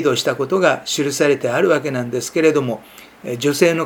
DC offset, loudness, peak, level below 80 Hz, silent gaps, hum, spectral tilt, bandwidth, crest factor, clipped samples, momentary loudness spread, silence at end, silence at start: under 0.1%; -18 LUFS; 0 dBFS; -64 dBFS; none; none; -4.5 dB/octave; 19.5 kHz; 18 dB; under 0.1%; 9 LU; 0 s; 0 s